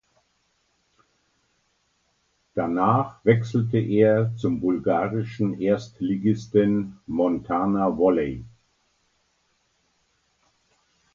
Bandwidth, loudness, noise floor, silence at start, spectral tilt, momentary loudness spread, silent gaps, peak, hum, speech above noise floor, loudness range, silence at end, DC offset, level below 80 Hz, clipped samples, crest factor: 7.4 kHz; -23 LUFS; -69 dBFS; 2.55 s; -9 dB/octave; 8 LU; none; -4 dBFS; none; 47 dB; 6 LU; 2.65 s; under 0.1%; -56 dBFS; under 0.1%; 22 dB